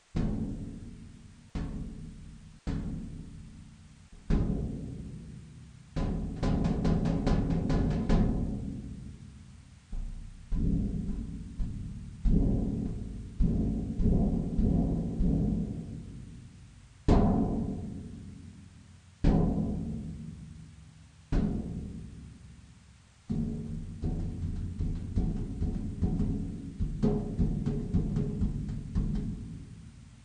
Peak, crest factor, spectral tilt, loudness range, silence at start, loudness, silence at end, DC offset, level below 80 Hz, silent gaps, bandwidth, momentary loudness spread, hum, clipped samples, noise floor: -10 dBFS; 22 dB; -9 dB/octave; 8 LU; 0.15 s; -33 LUFS; 0 s; under 0.1%; -36 dBFS; none; 9.8 kHz; 20 LU; none; under 0.1%; -57 dBFS